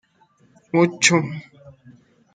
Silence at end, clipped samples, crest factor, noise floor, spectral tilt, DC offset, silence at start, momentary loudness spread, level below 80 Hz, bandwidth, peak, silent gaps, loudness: 0.65 s; under 0.1%; 22 dB; -59 dBFS; -3.5 dB/octave; under 0.1%; 0.75 s; 16 LU; -68 dBFS; 9.4 kHz; 0 dBFS; none; -19 LUFS